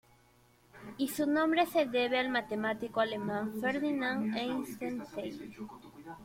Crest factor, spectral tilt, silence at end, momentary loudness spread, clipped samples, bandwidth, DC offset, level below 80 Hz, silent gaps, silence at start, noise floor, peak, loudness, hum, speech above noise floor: 20 dB; -4.5 dB/octave; 0 s; 18 LU; under 0.1%; 16.5 kHz; under 0.1%; -70 dBFS; none; 0.75 s; -65 dBFS; -14 dBFS; -33 LUFS; none; 32 dB